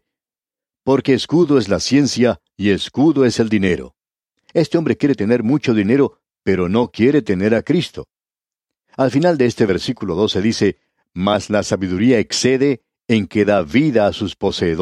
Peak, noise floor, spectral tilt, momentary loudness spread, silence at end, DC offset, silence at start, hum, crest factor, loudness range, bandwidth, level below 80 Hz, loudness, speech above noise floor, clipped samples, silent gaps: -2 dBFS; under -90 dBFS; -5.5 dB/octave; 6 LU; 0 s; under 0.1%; 0.85 s; none; 16 dB; 2 LU; 12 kHz; -48 dBFS; -17 LUFS; over 74 dB; under 0.1%; none